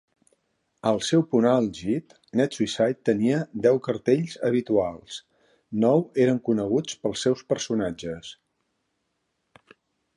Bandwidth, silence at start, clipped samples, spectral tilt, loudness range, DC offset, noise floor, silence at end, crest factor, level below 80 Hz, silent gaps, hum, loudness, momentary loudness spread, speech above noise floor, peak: 11.5 kHz; 0.85 s; under 0.1%; -6 dB/octave; 5 LU; under 0.1%; -76 dBFS; 1.85 s; 18 dB; -60 dBFS; none; none; -24 LUFS; 11 LU; 52 dB; -6 dBFS